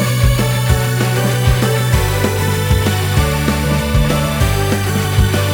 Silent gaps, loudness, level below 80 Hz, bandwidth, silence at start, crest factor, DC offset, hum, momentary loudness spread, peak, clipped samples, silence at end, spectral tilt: none; -15 LUFS; -22 dBFS; over 20 kHz; 0 s; 12 dB; under 0.1%; none; 2 LU; -2 dBFS; under 0.1%; 0 s; -5 dB/octave